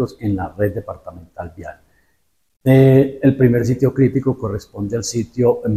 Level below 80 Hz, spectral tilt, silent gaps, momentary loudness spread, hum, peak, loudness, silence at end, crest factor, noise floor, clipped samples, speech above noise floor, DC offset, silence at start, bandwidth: -44 dBFS; -7.5 dB/octave; 2.56-2.60 s; 21 LU; none; -2 dBFS; -17 LUFS; 0 s; 16 dB; -67 dBFS; under 0.1%; 50 dB; under 0.1%; 0 s; 14 kHz